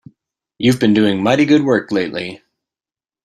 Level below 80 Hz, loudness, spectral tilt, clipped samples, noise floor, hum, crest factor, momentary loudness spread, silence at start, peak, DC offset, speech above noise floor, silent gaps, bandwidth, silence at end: -54 dBFS; -15 LUFS; -6 dB/octave; under 0.1%; under -90 dBFS; none; 16 dB; 11 LU; 0.6 s; 0 dBFS; under 0.1%; over 76 dB; none; 13 kHz; 0.9 s